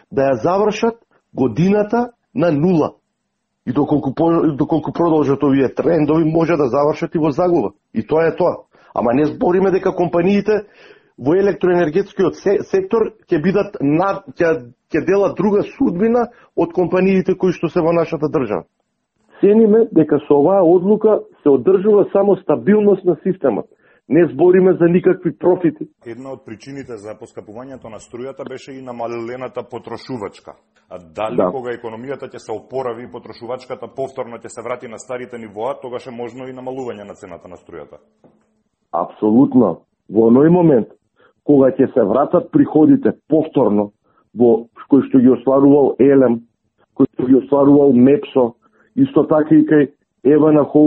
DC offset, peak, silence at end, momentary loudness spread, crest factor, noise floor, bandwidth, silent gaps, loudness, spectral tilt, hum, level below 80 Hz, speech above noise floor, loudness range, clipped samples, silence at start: under 0.1%; 0 dBFS; 0 s; 19 LU; 14 dB; -73 dBFS; 8.4 kHz; none; -15 LUFS; -8.5 dB/octave; none; -52 dBFS; 57 dB; 14 LU; under 0.1%; 0.1 s